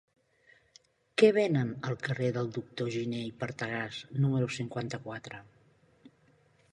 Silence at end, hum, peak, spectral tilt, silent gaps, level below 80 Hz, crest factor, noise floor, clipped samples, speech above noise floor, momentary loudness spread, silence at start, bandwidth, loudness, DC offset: 0.65 s; none; -10 dBFS; -6.5 dB/octave; none; -70 dBFS; 24 dB; -66 dBFS; under 0.1%; 35 dB; 14 LU; 1.15 s; 11 kHz; -31 LUFS; under 0.1%